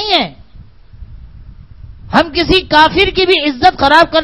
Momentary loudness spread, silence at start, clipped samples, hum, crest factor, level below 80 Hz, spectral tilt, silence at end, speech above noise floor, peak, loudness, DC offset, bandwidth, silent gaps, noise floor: 6 LU; 0 s; 0.5%; none; 12 dB; -32 dBFS; -5 dB/octave; 0 s; 28 dB; 0 dBFS; -10 LUFS; 0.7%; 12 kHz; none; -39 dBFS